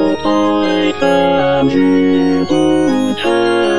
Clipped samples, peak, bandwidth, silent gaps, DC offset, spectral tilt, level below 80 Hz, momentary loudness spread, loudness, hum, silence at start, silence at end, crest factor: under 0.1%; 0 dBFS; 10.5 kHz; none; 3%; -6 dB/octave; -44 dBFS; 3 LU; -13 LUFS; none; 0 s; 0 s; 12 dB